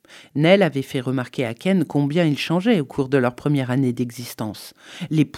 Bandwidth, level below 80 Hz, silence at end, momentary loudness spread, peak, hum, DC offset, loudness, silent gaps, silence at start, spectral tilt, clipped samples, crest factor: 16 kHz; -62 dBFS; 0 s; 14 LU; -2 dBFS; none; under 0.1%; -21 LUFS; none; 0.1 s; -6.5 dB/octave; under 0.1%; 20 dB